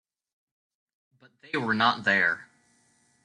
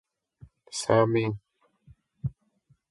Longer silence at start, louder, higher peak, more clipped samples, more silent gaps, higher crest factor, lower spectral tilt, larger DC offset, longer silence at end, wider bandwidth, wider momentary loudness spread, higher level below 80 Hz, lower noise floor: first, 1.55 s vs 0.7 s; about the same, -25 LUFS vs -27 LUFS; about the same, -8 dBFS vs -6 dBFS; neither; neither; about the same, 22 dB vs 24 dB; about the same, -4.5 dB/octave vs -5.5 dB/octave; neither; first, 0.8 s vs 0.6 s; about the same, 11 kHz vs 11.5 kHz; second, 11 LU vs 15 LU; second, -74 dBFS vs -58 dBFS; about the same, -66 dBFS vs -67 dBFS